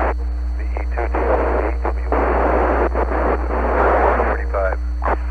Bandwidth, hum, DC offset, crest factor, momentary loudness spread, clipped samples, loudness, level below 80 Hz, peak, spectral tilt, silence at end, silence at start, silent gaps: 4.7 kHz; none; 0.7%; 14 dB; 8 LU; under 0.1%; -19 LUFS; -22 dBFS; -4 dBFS; -9 dB/octave; 0 s; 0 s; none